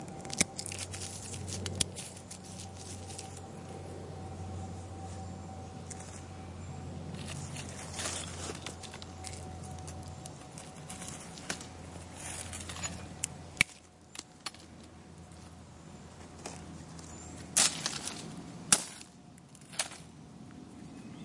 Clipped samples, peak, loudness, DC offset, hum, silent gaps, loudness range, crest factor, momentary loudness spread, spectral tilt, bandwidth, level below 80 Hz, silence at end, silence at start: under 0.1%; -6 dBFS; -37 LUFS; under 0.1%; none; none; 12 LU; 34 dB; 20 LU; -2 dB/octave; 11.5 kHz; -62 dBFS; 0 s; 0 s